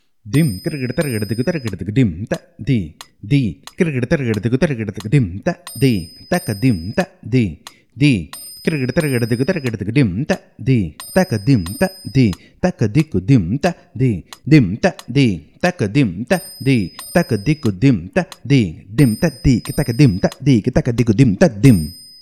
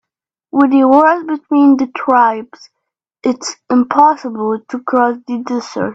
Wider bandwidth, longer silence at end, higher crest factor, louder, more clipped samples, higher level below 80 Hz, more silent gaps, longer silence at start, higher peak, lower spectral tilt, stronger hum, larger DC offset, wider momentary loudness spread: first, 14 kHz vs 8 kHz; first, 0.2 s vs 0 s; about the same, 16 dB vs 14 dB; second, -17 LUFS vs -13 LUFS; neither; first, -38 dBFS vs -60 dBFS; neither; second, 0.25 s vs 0.55 s; about the same, 0 dBFS vs 0 dBFS; first, -7 dB/octave vs -5 dB/octave; neither; first, 0.1% vs under 0.1%; second, 8 LU vs 11 LU